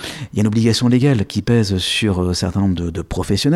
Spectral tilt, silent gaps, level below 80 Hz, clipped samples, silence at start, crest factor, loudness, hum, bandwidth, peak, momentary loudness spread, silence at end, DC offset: -5.5 dB/octave; none; -38 dBFS; under 0.1%; 0 s; 12 dB; -17 LUFS; none; 14.5 kHz; -4 dBFS; 8 LU; 0 s; under 0.1%